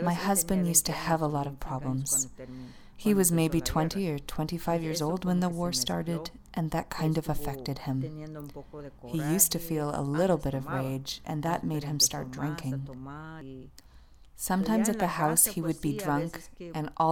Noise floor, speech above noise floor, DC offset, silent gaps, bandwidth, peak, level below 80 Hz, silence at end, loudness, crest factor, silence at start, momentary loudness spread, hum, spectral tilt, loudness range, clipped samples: -53 dBFS; 23 dB; under 0.1%; none; 19.5 kHz; -6 dBFS; -48 dBFS; 0 s; -29 LUFS; 24 dB; 0 s; 18 LU; none; -4.5 dB/octave; 4 LU; under 0.1%